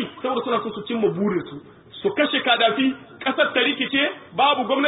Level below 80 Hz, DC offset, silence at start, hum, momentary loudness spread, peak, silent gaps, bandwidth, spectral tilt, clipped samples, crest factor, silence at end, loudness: -64 dBFS; under 0.1%; 0 s; none; 10 LU; -4 dBFS; none; 4 kHz; -9.5 dB/octave; under 0.1%; 18 dB; 0 s; -21 LUFS